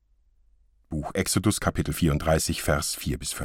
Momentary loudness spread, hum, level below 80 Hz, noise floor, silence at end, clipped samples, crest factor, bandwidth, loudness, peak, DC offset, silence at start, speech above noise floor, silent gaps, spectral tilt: 7 LU; none; -38 dBFS; -62 dBFS; 0 s; under 0.1%; 18 dB; 17 kHz; -26 LUFS; -8 dBFS; under 0.1%; 0.9 s; 37 dB; none; -4.5 dB/octave